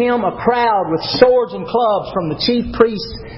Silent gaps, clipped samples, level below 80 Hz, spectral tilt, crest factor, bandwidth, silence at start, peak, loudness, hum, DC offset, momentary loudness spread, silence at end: none; under 0.1%; -40 dBFS; -8 dB/octave; 16 dB; 5.8 kHz; 0 s; 0 dBFS; -16 LUFS; none; under 0.1%; 7 LU; 0 s